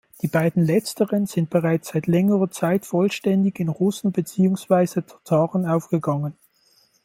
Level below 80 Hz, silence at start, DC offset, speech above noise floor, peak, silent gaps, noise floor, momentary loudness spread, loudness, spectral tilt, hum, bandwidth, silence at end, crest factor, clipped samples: -62 dBFS; 0.25 s; under 0.1%; 40 dB; -4 dBFS; none; -60 dBFS; 5 LU; -22 LUFS; -7 dB/octave; none; 16.5 kHz; 0.7 s; 16 dB; under 0.1%